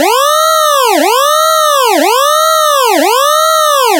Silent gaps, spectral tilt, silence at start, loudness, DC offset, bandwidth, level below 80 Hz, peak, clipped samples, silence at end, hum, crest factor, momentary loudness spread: none; 2 dB/octave; 0 s; -8 LUFS; under 0.1%; 16.5 kHz; under -90 dBFS; 0 dBFS; under 0.1%; 0 s; none; 8 dB; 1 LU